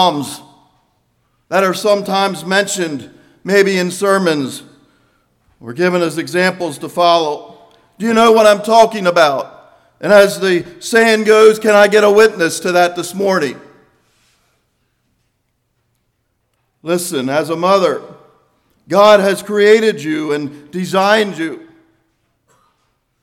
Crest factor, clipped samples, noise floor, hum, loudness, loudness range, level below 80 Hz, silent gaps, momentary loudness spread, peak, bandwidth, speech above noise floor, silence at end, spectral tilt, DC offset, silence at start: 14 dB; 0.2%; -66 dBFS; none; -13 LUFS; 8 LU; -60 dBFS; none; 15 LU; 0 dBFS; 16.5 kHz; 53 dB; 1.65 s; -4 dB/octave; under 0.1%; 0 s